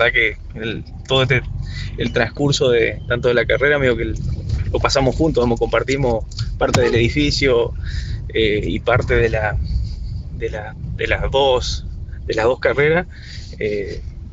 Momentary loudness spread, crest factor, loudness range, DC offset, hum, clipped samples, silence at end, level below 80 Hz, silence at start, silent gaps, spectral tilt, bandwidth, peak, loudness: 12 LU; 18 dB; 3 LU; under 0.1%; none; under 0.1%; 0 s; -28 dBFS; 0 s; none; -5.5 dB/octave; 8.2 kHz; 0 dBFS; -18 LUFS